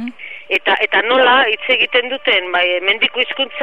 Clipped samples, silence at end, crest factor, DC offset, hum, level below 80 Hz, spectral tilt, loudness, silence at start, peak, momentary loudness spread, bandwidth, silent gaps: under 0.1%; 0 s; 14 dB; 0.9%; none; -68 dBFS; -3.5 dB/octave; -14 LUFS; 0 s; 0 dBFS; 7 LU; 7.2 kHz; none